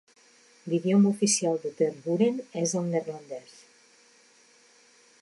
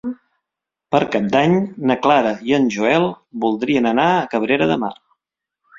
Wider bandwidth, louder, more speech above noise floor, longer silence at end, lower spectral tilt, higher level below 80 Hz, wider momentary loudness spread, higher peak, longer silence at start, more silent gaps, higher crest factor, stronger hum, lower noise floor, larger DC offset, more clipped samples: first, 11.5 kHz vs 7.6 kHz; second, -26 LUFS vs -17 LUFS; second, 33 dB vs 67 dB; first, 1.8 s vs 0.85 s; second, -5 dB/octave vs -6.5 dB/octave; second, -80 dBFS vs -56 dBFS; first, 18 LU vs 7 LU; second, -12 dBFS vs 0 dBFS; first, 0.65 s vs 0.05 s; neither; about the same, 16 dB vs 18 dB; neither; second, -59 dBFS vs -84 dBFS; neither; neither